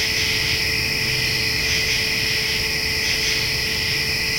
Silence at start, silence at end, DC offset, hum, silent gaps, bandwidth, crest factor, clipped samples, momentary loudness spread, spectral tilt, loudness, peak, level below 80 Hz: 0 s; 0 s; under 0.1%; none; none; 16.5 kHz; 14 dB; under 0.1%; 1 LU; -1.5 dB/octave; -18 LUFS; -8 dBFS; -38 dBFS